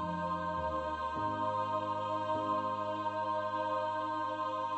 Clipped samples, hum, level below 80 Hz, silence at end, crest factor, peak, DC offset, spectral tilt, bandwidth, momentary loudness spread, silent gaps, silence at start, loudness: under 0.1%; none; -60 dBFS; 0 s; 12 dB; -22 dBFS; under 0.1%; -6.5 dB/octave; 8.4 kHz; 2 LU; none; 0 s; -35 LUFS